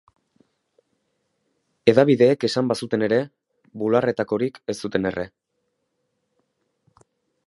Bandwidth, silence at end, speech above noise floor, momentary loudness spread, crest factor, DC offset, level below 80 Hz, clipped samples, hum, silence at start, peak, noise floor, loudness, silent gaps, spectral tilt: 11.5 kHz; 2.2 s; 54 dB; 13 LU; 22 dB; under 0.1%; -60 dBFS; under 0.1%; none; 1.85 s; -2 dBFS; -75 dBFS; -21 LUFS; none; -6.5 dB/octave